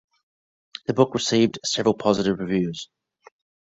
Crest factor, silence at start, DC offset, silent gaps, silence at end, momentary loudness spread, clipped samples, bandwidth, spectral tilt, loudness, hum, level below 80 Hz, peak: 20 dB; 0.9 s; under 0.1%; none; 0.9 s; 14 LU; under 0.1%; 8.2 kHz; -5 dB/octave; -22 LUFS; none; -58 dBFS; -4 dBFS